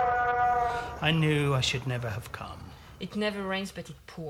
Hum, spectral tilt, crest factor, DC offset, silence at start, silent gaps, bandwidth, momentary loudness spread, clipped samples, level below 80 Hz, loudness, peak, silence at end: none; -5 dB/octave; 20 dB; under 0.1%; 0 s; none; 16 kHz; 17 LU; under 0.1%; -50 dBFS; -28 LUFS; -10 dBFS; 0 s